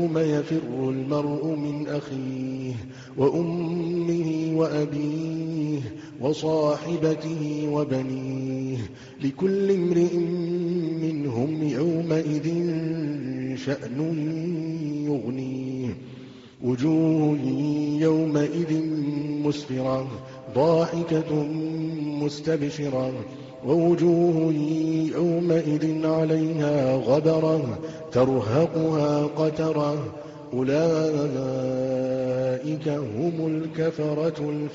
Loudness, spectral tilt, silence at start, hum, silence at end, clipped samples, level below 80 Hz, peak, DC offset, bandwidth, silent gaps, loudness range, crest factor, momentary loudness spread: -25 LUFS; -7.5 dB/octave; 0 s; none; 0 s; under 0.1%; -60 dBFS; -8 dBFS; under 0.1%; 7.6 kHz; none; 4 LU; 16 dB; 9 LU